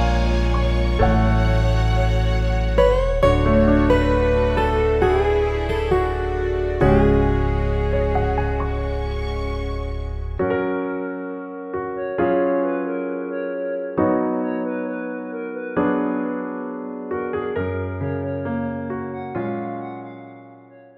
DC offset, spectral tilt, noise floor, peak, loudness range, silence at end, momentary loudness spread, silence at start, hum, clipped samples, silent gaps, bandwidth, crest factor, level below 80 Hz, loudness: under 0.1%; -8 dB/octave; -45 dBFS; -4 dBFS; 8 LU; 0.15 s; 11 LU; 0 s; none; under 0.1%; none; 8.6 kHz; 16 dB; -26 dBFS; -21 LUFS